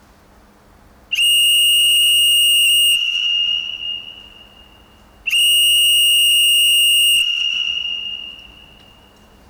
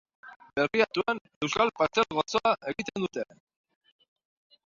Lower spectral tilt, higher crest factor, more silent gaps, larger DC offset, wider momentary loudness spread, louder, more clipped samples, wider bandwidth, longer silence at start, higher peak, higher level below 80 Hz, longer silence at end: second, 4 dB/octave vs -4 dB/octave; second, 8 dB vs 22 dB; second, none vs 0.36-0.40 s, 1.21-1.25 s, 1.36-1.41 s; neither; first, 14 LU vs 8 LU; first, -12 LUFS vs -28 LUFS; neither; first, over 20 kHz vs 7.6 kHz; first, 1.1 s vs 0.25 s; about the same, -10 dBFS vs -8 dBFS; first, -54 dBFS vs -64 dBFS; second, 1.1 s vs 1.45 s